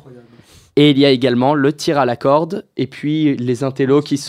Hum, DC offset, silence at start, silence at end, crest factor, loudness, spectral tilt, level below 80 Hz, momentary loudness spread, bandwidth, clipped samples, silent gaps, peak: none; under 0.1%; 0.1 s; 0 s; 16 dB; -15 LUFS; -6 dB/octave; -60 dBFS; 10 LU; 13 kHz; under 0.1%; none; 0 dBFS